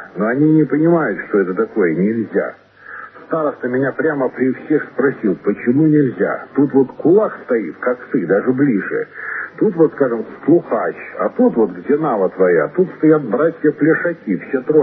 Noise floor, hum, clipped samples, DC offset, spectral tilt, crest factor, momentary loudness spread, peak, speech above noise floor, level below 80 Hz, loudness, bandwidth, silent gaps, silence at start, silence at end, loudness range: -35 dBFS; none; under 0.1%; under 0.1%; -12.5 dB/octave; 16 dB; 8 LU; 0 dBFS; 20 dB; -66 dBFS; -16 LUFS; 3.8 kHz; none; 0 s; 0 s; 3 LU